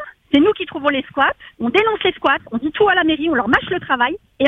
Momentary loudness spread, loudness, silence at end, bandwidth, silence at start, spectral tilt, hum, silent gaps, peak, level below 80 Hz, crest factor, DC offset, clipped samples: 5 LU; -17 LUFS; 0 s; 7.4 kHz; 0 s; -6 dB/octave; none; none; 0 dBFS; -48 dBFS; 16 dB; under 0.1%; under 0.1%